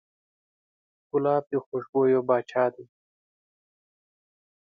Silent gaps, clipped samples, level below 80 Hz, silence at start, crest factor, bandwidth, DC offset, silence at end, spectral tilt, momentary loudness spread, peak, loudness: 1.66-1.72 s, 1.89-1.93 s; under 0.1%; -76 dBFS; 1.15 s; 18 dB; 6.8 kHz; under 0.1%; 1.85 s; -8.5 dB/octave; 8 LU; -10 dBFS; -26 LUFS